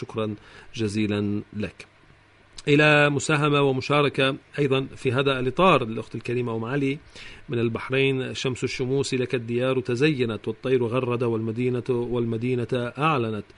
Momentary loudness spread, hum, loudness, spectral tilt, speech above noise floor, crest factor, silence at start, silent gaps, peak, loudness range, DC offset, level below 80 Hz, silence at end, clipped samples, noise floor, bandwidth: 11 LU; none; -24 LUFS; -6 dB/octave; 31 dB; 18 dB; 0 s; none; -6 dBFS; 4 LU; under 0.1%; -52 dBFS; 0.15 s; under 0.1%; -55 dBFS; 10.5 kHz